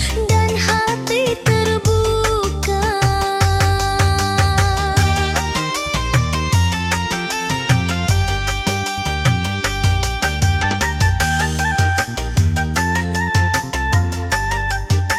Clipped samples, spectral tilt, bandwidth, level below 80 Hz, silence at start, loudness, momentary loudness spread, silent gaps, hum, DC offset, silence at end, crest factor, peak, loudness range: under 0.1%; -4.5 dB/octave; 16 kHz; -28 dBFS; 0 s; -18 LUFS; 4 LU; none; none; under 0.1%; 0 s; 14 dB; -4 dBFS; 2 LU